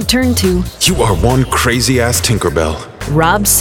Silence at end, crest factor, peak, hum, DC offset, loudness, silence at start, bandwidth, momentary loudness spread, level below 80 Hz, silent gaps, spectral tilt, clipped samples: 0 s; 12 dB; 0 dBFS; none; under 0.1%; -12 LUFS; 0 s; over 20 kHz; 5 LU; -24 dBFS; none; -4 dB/octave; under 0.1%